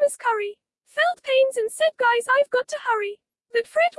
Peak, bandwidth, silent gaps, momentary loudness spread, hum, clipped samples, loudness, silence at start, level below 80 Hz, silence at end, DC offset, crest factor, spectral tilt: -10 dBFS; 12 kHz; none; 8 LU; none; under 0.1%; -22 LUFS; 0 s; -82 dBFS; 0.1 s; under 0.1%; 14 dB; 0.5 dB/octave